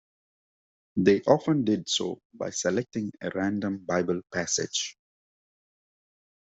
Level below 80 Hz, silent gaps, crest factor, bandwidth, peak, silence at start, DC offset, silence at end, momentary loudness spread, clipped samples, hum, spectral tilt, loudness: -68 dBFS; 2.25-2.30 s; 24 dB; 8.2 kHz; -4 dBFS; 0.95 s; under 0.1%; 1.6 s; 11 LU; under 0.1%; none; -4 dB/octave; -27 LUFS